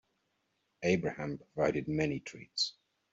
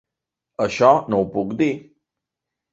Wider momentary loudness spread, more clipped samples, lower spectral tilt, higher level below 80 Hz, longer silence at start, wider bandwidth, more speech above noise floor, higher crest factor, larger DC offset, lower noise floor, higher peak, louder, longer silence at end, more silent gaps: second, 9 LU vs 14 LU; neither; second, -4 dB/octave vs -6.5 dB/octave; second, -64 dBFS vs -56 dBFS; first, 0.8 s vs 0.6 s; about the same, 8 kHz vs 8 kHz; second, 46 dB vs 66 dB; about the same, 20 dB vs 20 dB; neither; second, -79 dBFS vs -85 dBFS; second, -16 dBFS vs -2 dBFS; second, -34 LUFS vs -19 LUFS; second, 0.4 s vs 0.95 s; neither